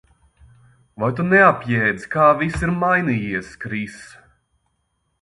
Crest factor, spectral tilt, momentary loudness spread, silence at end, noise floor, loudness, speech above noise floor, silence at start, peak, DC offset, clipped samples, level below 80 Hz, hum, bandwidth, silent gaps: 20 dB; -7 dB/octave; 14 LU; 1.15 s; -70 dBFS; -18 LUFS; 51 dB; 1 s; 0 dBFS; under 0.1%; under 0.1%; -44 dBFS; none; 11.5 kHz; none